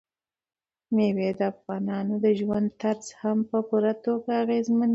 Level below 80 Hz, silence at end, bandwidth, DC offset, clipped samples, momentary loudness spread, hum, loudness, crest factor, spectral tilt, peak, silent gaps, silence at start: -68 dBFS; 0 s; 8 kHz; under 0.1%; under 0.1%; 6 LU; none; -26 LUFS; 14 dB; -7 dB/octave; -12 dBFS; none; 0.9 s